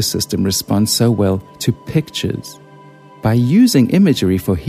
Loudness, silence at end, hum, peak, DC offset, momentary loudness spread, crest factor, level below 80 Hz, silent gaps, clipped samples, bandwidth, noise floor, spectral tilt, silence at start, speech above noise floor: -15 LUFS; 0 s; none; -2 dBFS; under 0.1%; 10 LU; 14 dB; -42 dBFS; none; under 0.1%; 15.5 kHz; -41 dBFS; -5.5 dB/octave; 0 s; 26 dB